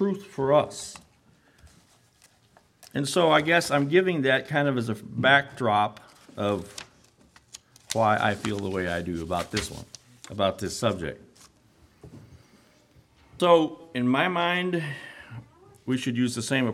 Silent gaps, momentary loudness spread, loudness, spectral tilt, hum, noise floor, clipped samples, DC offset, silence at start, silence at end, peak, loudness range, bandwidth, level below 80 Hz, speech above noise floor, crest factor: none; 21 LU; -25 LUFS; -5 dB/octave; none; -61 dBFS; under 0.1%; under 0.1%; 0 s; 0 s; -4 dBFS; 8 LU; 15.5 kHz; -58 dBFS; 36 dB; 22 dB